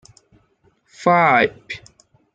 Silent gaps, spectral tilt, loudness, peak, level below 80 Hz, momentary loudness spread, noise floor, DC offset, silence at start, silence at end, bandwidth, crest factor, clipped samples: none; -6 dB/octave; -16 LUFS; -2 dBFS; -60 dBFS; 20 LU; -61 dBFS; under 0.1%; 1 s; 0.55 s; 9.2 kHz; 18 dB; under 0.1%